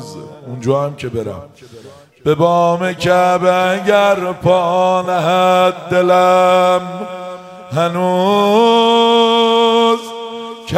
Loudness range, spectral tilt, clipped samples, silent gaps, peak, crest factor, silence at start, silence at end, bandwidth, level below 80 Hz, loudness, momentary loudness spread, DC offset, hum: 3 LU; -5.5 dB/octave; under 0.1%; none; 0 dBFS; 14 dB; 0 s; 0 s; 15.5 kHz; -54 dBFS; -13 LUFS; 16 LU; under 0.1%; none